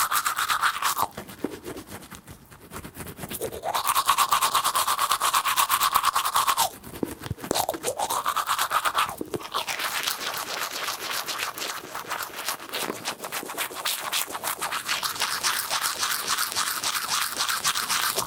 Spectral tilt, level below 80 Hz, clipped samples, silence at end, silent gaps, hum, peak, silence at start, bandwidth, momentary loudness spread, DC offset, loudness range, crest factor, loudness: -0.5 dB/octave; -60 dBFS; under 0.1%; 0 s; none; none; -4 dBFS; 0 s; 19 kHz; 13 LU; under 0.1%; 7 LU; 22 dB; -25 LUFS